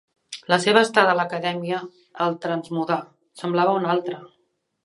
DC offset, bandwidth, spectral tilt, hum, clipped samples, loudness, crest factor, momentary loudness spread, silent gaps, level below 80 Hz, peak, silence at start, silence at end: under 0.1%; 11.5 kHz; -4.5 dB/octave; none; under 0.1%; -22 LUFS; 22 dB; 17 LU; none; -74 dBFS; 0 dBFS; 0.3 s; 0.6 s